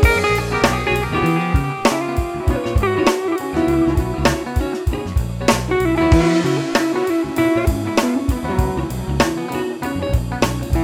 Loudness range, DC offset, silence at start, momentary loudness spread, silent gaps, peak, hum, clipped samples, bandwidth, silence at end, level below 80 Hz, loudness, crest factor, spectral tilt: 2 LU; under 0.1%; 0 s; 6 LU; none; -2 dBFS; none; under 0.1%; 17 kHz; 0 s; -26 dBFS; -18 LUFS; 16 dB; -6 dB/octave